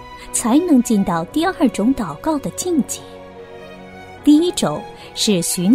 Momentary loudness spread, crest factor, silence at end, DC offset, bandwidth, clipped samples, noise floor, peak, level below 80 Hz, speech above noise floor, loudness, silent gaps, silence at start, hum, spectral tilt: 22 LU; 16 dB; 0 s; under 0.1%; 16 kHz; under 0.1%; -37 dBFS; -2 dBFS; -46 dBFS; 20 dB; -18 LUFS; none; 0 s; none; -4.5 dB/octave